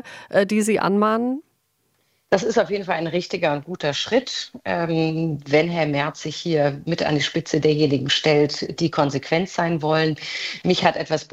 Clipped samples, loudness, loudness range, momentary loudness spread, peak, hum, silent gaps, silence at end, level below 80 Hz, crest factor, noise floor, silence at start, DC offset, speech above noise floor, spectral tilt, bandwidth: under 0.1%; -21 LUFS; 3 LU; 7 LU; -2 dBFS; none; none; 0.05 s; -58 dBFS; 20 dB; -68 dBFS; 0.05 s; under 0.1%; 47 dB; -5 dB/octave; 14.5 kHz